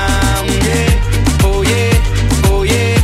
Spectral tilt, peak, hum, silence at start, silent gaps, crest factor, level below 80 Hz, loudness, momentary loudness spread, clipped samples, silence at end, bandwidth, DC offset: -5 dB/octave; -2 dBFS; none; 0 s; none; 10 dB; -16 dBFS; -13 LUFS; 2 LU; under 0.1%; 0 s; 16 kHz; under 0.1%